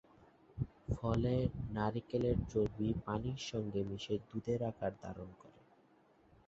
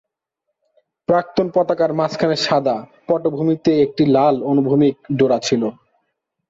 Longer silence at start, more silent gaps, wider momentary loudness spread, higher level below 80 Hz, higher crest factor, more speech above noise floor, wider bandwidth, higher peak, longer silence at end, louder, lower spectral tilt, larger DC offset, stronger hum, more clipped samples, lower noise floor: second, 0.55 s vs 1.1 s; neither; first, 9 LU vs 6 LU; first, -52 dBFS vs -58 dBFS; about the same, 18 dB vs 14 dB; second, 31 dB vs 61 dB; about the same, 7.8 kHz vs 7.8 kHz; second, -22 dBFS vs -4 dBFS; first, 0.95 s vs 0.75 s; second, -39 LUFS vs -18 LUFS; about the same, -7 dB/octave vs -6 dB/octave; neither; neither; neither; second, -68 dBFS vs -77 dBFS